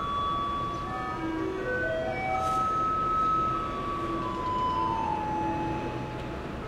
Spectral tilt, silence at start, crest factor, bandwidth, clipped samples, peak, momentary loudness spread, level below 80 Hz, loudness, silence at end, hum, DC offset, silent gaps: -6 dB/octave; 0 s; 12 dB; 15.5 kHz; under 0.1%; -18 dBFS; 7 LU; -46 dBFS; -29 LUFS; 0 s; none; under 0.1%; none